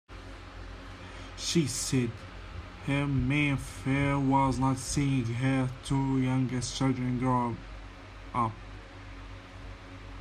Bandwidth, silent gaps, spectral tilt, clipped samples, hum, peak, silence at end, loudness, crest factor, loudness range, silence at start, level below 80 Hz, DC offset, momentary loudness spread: 14.5 kHz; none; -5.5 dB/octave; under 0.1%; none; -14 dBFS; 0 s; -29 LUFS; 16 dB; 5 LU; 0.1 s; -46 dBFS; under 0.1%; 19 LU